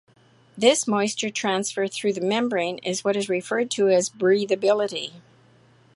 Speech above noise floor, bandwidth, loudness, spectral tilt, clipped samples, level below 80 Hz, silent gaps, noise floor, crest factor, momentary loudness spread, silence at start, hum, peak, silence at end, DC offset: 33 dB; 11.5 kHz; -23 LUFS; -3.5 dB/octave; under 0.1%; -74 dBFS; none; -56 dBFS; 20 dB; 6 LU; 0.55 s; none; -4 dBFS; 0.75 s; under 0.1%